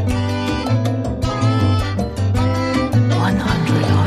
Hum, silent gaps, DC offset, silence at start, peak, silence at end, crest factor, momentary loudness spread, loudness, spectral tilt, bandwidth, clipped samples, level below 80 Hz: none; none; under 0.1%; 0 s; -4 dBFS; 0 s; 12 dB; 5 LU; -18 LUFS; -7 dB/octave; 12.5 kHz; under 0.1%; -32 dBFS